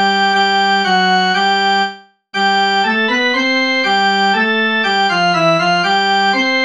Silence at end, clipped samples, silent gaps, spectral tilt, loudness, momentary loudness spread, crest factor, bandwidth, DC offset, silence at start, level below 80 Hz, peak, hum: 0 s; under 0.1%; none; -3.5 dB/octave; -13 LUFS; 1 LU; 12 dB; 10 kHz; 0.2%; 0 s; -68 dBFS; -2 dBFS; none